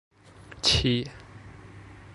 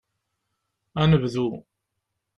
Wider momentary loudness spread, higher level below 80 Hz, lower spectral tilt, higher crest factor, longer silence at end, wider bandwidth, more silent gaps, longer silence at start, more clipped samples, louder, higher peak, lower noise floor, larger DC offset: first, 25 LU vs 15 LU; first, -44 dBFS vs -50 dBFS; second, -4 dB/octave vs -8 dB/octave; about the same, 22 dB vs 20 dB; second, 0 s vs 0.75 s; first, 11.5 kHz vs 7.6 kHz; neither; second, 0.5 s vs 0.95 s; neither; about the same, -24 LUFS vs -23 LUFS; second, -10 dBFS vs -6 dBFS; second, -49 dBFS vs -80 dBFS; neither